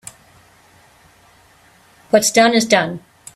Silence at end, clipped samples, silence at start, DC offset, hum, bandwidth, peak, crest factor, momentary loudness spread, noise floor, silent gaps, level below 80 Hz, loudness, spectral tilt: 0.4 s; under 0.1%; 2.15 s; under 0.1%; none; 15.5 kHz; 0 dBFS; 20 dB; 20 LU; -51 dBFS; none; -60 dBFS; -14 LUFS; -3 dB/octave